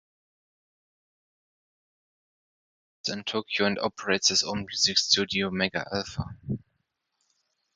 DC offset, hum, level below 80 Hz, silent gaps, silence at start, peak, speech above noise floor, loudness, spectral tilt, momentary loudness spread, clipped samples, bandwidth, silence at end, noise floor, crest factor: under 0.1%; none; -56 dBFS; none; 3.05 s; -6 dBFS; 50 dB; -26 LUFS; -2.5 dB/octave; 13 LU; under 0.1%; 9.6 kHz; 1.15 s; -78 dBFS; 24 dB